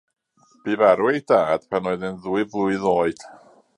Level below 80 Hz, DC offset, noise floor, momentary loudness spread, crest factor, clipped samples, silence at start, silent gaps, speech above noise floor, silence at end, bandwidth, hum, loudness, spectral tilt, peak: -60 dBFS; under 0.1%; -55 dBFS; 10 LU; 20 dB; under 0.1%; 0.65 s; none; 35 dB; 0.4 s; 11 kHz; none; -21 LUFS; -6.5 dB/octave; -2 dBFS